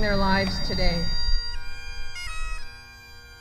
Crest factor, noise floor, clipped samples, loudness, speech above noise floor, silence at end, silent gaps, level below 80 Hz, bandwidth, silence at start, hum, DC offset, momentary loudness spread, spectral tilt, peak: 16 dB; -45 dBFS; under 0.1%; -28 LUFS; 23 dB; 0 s; none; -28 dBFS; 10 kHz; 0 s; none; under 0.1%; 21 LU; -5 dB/octave; -8 dBFS